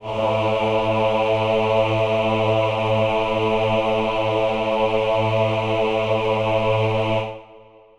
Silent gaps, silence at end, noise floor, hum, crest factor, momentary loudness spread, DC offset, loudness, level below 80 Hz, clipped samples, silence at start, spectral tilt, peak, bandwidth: none; 0.4 s; -47 dBFS; none; 12 dB; 2 LU; under 0.1%; -20 LUFS; -42 dBFS; under 0.1%; 0 s; -6.5 dB/octave; -8 dBFS; 11 kHz